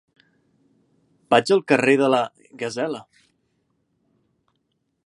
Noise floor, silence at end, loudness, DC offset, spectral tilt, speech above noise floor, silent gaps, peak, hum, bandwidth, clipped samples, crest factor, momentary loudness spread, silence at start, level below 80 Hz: -73 dBFS; 2.05 s; -20 LUFS; under 0.1%; -5 dB/octave; 53 dB; none; -2 dBFS; none; 11 kHz; under 0.1%; 24 dB; 14 LU; 1.3 s; -74 dBFS